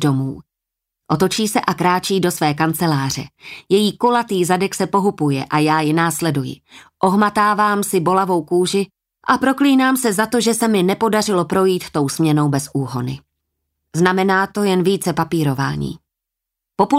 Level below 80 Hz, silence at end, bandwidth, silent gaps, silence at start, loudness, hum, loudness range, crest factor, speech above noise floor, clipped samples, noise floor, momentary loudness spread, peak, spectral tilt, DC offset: -54 dBFS; 0 s; 16 kHz; none; 0 s; -17 LUFS; none; 3 LU; 16 dB; 66 dB; under 0.1%; -82 dBFS; 11 LU; -2 dBFS; -5 dB/octave; under 0.1%